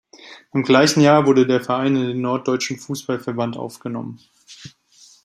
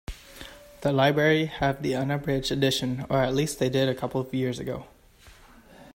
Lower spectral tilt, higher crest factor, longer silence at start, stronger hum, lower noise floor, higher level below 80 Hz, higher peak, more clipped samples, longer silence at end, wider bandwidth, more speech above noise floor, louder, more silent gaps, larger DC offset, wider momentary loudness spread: about the same, -5 dB/octave vs -5.5 dB/octave; about the same, 18 dB vs 20 dB; first, 0.25 s vs 0.1 s; neither; second, -44 dBFS vs -53 dBFS; second, -64 dBFS vs -50 dBFS; first, -2 dBFS vs -8 dBFS; neither; first, 0.55 s vs 0.1 s; second, 14.5 kHz vs 16 kHz; about the same, 26 dB vs 28 dB; first, -18 LUFS vs -26 LUFS; neither; neither; about the same, 16 LU vs 17 LU